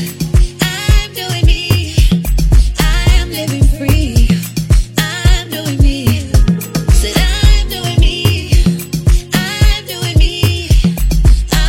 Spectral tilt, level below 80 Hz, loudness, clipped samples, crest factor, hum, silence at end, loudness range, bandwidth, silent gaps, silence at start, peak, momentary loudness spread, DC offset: -5 dB/octave; -12 dBFS; -13 LUFS; under 0.1%; 10 dB; none; 0 s; 1 LU; 17 kHz; none; 0 s; 0 dBFS; 3 LU; under 0.1%